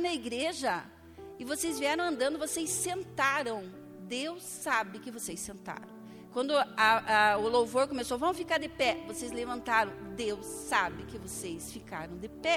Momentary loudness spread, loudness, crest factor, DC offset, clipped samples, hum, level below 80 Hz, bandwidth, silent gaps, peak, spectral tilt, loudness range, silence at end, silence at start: 17 LU; -31 LUFS; 20 dB; under 0.1%; under 0.1%; none; -60 dBFS; 17 kHz; none; -12 dBFS; -2.5 dB/octave; 6 LU; 0 s; 0 s